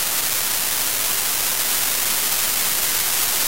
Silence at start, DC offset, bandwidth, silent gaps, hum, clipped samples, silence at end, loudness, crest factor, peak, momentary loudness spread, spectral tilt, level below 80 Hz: 0 s; 2%; 16 kHz; none; none; under 0.1%; 0 s; -18 LUFS; 18 dB; -2 dBFS; 1 LU; 1 dB/octave; -50 dBFS